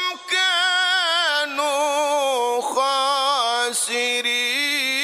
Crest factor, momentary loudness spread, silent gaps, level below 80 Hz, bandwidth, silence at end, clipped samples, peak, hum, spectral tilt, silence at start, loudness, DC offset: 12 dB; 4 LU; none; -82 dBFS; 15.5 kHz; 0 s; under 0.1%; -8 dBFS; none; 2 dB/octave; 0 s; -19 LUFS; under 0.1%